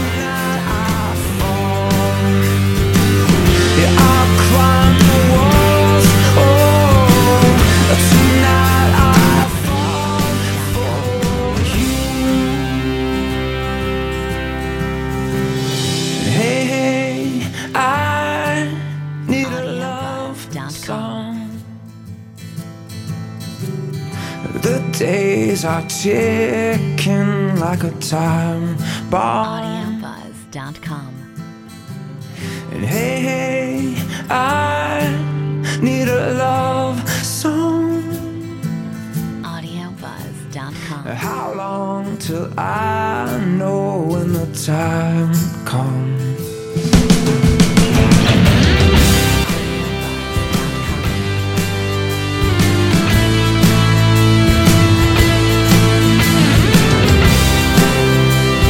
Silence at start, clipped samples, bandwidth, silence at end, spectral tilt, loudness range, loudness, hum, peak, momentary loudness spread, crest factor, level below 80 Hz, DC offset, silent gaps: 0 s; under 0.1%; 17 kHz; 0 s; -5.5 dB/octave; 14 LU; -15 LUFS; none; 0 dBFS; 16 LU; 14 dB; -28 dBFS; under 0.1%; none